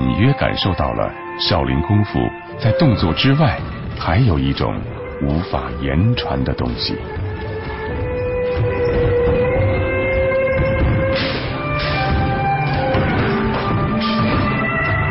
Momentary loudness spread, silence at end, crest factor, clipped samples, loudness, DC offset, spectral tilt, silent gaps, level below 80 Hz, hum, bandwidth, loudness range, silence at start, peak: 8 LU; 0 s; 14 dB; under 0.1%; -18 LUFS; under 0.1%; -11 dB/octave; none; -28 dBFS; none; 5.8 kHz; 3 LU; 0 s; -4 dBFS